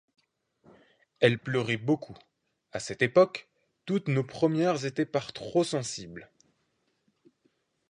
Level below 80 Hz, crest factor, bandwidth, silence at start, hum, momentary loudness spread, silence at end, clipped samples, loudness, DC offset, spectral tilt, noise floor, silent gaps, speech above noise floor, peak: -68 dBFS; 24 dB; 11.5 kHz; 1.2 s; none; 17 LU; 1.65 s; under 0.1%; -28 LUFS; under 0.1%; -5.5 dB/octave; -75 dBFS; none; 47 dB; -8 dBFS